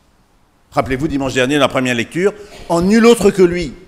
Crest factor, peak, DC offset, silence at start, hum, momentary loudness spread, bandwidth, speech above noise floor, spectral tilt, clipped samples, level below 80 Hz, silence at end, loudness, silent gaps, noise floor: 14 dB; 0 dBFS; under 0.1%; 0.75 s; none; 9 LU; 16 kHz; 40 dB; -5 dB/octave; under 0.1%; -38 dBFS; 0.1 s; -14 LUFS; none; -53 dBFS